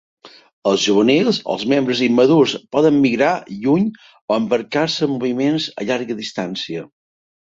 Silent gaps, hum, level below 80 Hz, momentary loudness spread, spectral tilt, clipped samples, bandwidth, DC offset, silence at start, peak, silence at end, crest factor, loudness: 0.53-0.62 s, 4.21-4.28 s; none; -60 dBFS; 10 LU; -5 dB/octave; under 0.1%; 7.8 kHz; under 0.1%; 0.25 s; -2 dBFS; 0.7 s; 16 dB; -17 LUFS